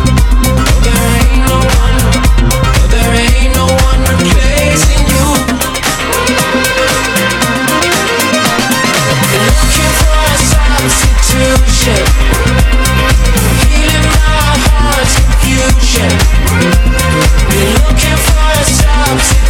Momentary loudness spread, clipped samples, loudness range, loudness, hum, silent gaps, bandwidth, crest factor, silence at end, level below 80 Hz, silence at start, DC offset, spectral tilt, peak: 1 LU; under 0.1%; 1 LU; -9 LUFS; none; none; 17.5 kHz; 8 dB; 0 s; -10 dBFS; 0 s; under 0.1%; -4 dB/octave; 0 dBFS